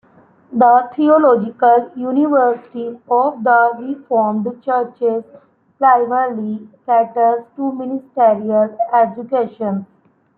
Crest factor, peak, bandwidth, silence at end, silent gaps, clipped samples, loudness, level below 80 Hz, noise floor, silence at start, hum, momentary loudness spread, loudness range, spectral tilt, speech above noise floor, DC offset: 14 dB; -2 dBFS; 4.2 kHz; 0.55 s; none; under 0.1%; -16 LUFS; -68 dBFS; -49 dBFS; 0.5 s; none; 12 LU; 3 LU; -11 dB/octave; 34 dB; under 0.1%